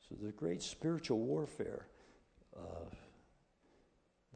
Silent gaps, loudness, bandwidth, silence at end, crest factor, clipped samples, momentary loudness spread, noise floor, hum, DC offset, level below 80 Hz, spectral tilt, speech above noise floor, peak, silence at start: none; -41 LUFS; 9.4 kHz; 0 s; 20 dB; under 0.1%; 19 LU; -75 dBFS; none; under 0.1%; -68 dBFS; -5.5 dB/octave; 34 dB; -22 dBFS; 0.05 s